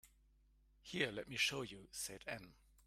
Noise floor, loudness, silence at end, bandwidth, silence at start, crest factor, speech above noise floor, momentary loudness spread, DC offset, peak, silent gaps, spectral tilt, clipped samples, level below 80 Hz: -72 dBFS; -42 LUFS; 0.35 s; 16 kHz; 0.05 s; 24 dB; 28 dB; 12 LU; under 0.1%; -24 dBFS; none; -2.5 dB/octave; under 0.1%; -70 dBFS